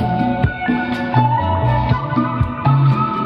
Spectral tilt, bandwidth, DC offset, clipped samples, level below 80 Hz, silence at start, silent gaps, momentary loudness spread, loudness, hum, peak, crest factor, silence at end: -9.5 dB/octave; 5.6 kHz; under 0.1%; under 0.1%; -32 dBFS; 0 s; none; 5 LU; -17 LUFS; none; -2 dBFS; 14 dB; 0 s